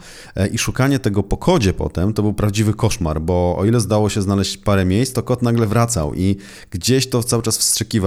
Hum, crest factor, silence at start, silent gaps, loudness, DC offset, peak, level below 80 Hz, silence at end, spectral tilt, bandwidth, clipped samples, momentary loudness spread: none; 16 dB; 0 s; none; -18 LUFS; under 0.1%; -2 dBFS; -34 dBFS; 0 s; -5 dB/octave; 16 kHz; under 0.1%; 5 LU